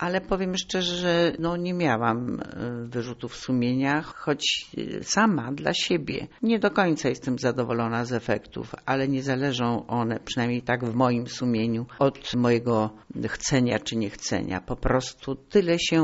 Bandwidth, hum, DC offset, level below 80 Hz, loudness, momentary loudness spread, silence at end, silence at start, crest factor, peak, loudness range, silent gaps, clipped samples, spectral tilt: 8 kHz; none; under 0.1%; -46 dBFS; -26 LUFS; 10 LU; 0 s; 0 s; 18 dB; -8 dBFS; 2 LU; none; under 0.1%; -4.5 dB/octave